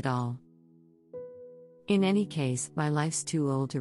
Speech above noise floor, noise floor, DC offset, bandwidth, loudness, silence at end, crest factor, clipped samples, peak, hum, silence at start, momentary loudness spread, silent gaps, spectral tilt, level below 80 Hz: 31 dB; -60 dBFS; under 0.1%; 12 kHz; -29 LUFS; 0 s; 16 dB; under 0.1%; -14 dBFS; none; 0 s; 21 LU; none; -5.5 dB/octave; -70 dBFS